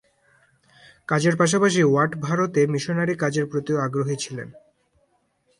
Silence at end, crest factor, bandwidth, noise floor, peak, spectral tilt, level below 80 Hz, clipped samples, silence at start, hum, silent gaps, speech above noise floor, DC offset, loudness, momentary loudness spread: 1 s; 18 dB; 11.5 kHz; -67 dBFS; -6 dBFS; -5.5 dB/octave; -64 dBFS; under 0.1%; 1.1 s; none; none; 46 dB; under 0.1%; -22 LUFS; 12 LU